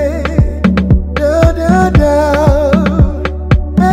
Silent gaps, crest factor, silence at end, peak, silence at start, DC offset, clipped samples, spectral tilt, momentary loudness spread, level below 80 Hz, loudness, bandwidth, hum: none; 10 dB; 0 s; 0 dBFS; 0 s; under 0.1%; under 0.1%; -8 dB/octave; 4 LU; -16 dBFS; -11 LUFS; 13 kHz; none